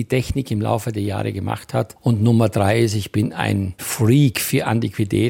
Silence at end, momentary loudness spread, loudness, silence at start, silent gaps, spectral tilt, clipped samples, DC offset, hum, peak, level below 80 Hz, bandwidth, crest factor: 0 s; 8 LU; -20 LUFS; 0 s; none; -6 dB/octave; under 0.1%; under 0.1%; none; -2 dBFS; -44 dBFS; 17 kHz; 16 dB